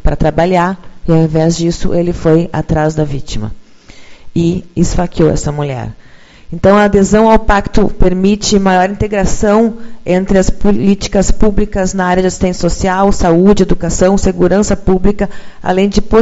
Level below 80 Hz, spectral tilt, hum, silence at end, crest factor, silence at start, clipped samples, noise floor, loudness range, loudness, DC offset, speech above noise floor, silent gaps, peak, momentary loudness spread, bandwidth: -20 dBFS; -6 dB/octave; none; 0 s; 10 dB; 0 s; 0.5%; -34 dBFS; 5 LU; -12 LUFS; under 0.1%; 24 dB; none; 0 dBFS; 10 LU; 8 kHz